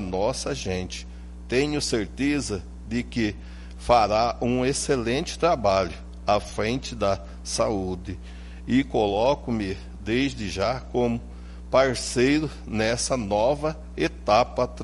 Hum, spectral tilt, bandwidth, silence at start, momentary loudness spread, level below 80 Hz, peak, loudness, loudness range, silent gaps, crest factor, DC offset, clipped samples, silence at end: none; -4.5 dB/octave; 11.5 kHz; 0 s; 13 LU; -40 dBFS; -6 dBFS; -25 LUFS; 4 LU; none; 18 dB; under 0.1%; under 0.1%; 0 s